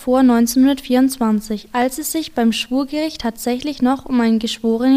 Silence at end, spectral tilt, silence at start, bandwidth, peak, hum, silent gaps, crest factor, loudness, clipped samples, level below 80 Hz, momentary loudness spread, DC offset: 0 s; -4 dB/octave; 0 s; 16 kHz; -4 dBFS; none; none; 12 dB; -17 LUFS; under 0.1%; -46 dBFS; 8 LU; under 0.1%